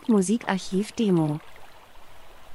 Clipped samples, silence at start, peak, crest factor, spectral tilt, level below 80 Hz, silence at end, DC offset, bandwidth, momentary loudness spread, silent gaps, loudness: under 0.1%; 0.05 s; -8 dBFS; 18 dB; -6 dB/octave; -56 dBFS; 0 s; under 0.1%; 12 kHz; 6 LU; none; -25 LUFS